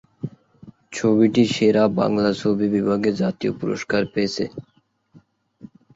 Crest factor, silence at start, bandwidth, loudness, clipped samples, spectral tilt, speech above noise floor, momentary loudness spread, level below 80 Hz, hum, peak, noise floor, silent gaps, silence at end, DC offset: 18 dB; 0.25 s; 8 kHz; -20 LUFS; under 0.1%; -6 dB/octave; 35 dB; 16 LU; -58 dBFS; none; -4 dBFS; -54 dBFS; none; 0.3 s; under 0.1%